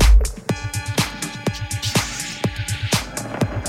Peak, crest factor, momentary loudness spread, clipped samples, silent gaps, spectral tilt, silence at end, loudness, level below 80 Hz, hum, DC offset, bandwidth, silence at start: -2 dBFS; 18 dB; 6 LU; under 0.1%; none; -4 dB/octave; 0 s; -23 LUFS; -22 dBFS; none; under 0.1%; 16 kHz; 0 s